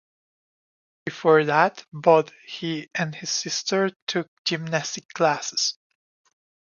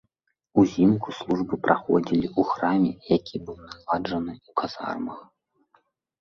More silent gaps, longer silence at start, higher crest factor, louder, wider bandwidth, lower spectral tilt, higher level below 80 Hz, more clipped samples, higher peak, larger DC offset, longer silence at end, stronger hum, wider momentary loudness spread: first, 3.96-4.07 s, 4.28-4.45 s, 5.05-5.09 s vs none; first, 1.05 s vs 0.55 s; about the same, 22 dB vs 22 dB; about the same, -23 LUFS vs -25 LUFS; about the same, 7.4 kHz vs 7.2 kHz; second, -3.5 dB/octave vs -7.5 dB/octave; second, -76 dBFS vs -56 dBFS; neither; about the same, -4 dBFS vs -4 dBFS; neither; about the same, 1 s vs 0.95 s; neither; about the same, 13 LU vs 14 LU